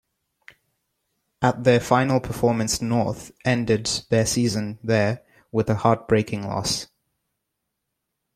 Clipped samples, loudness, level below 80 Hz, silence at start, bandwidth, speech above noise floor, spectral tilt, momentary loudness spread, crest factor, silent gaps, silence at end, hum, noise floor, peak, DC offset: under 0.1%; -22 LUFS; -50 dBFS; 1.4 s; 15 kHz; 58 dB; -5 dB/octave; 8 LU; 20 dB; none; 1.5 s; none; -80 dBFS; -2 dBFS; under 0.1%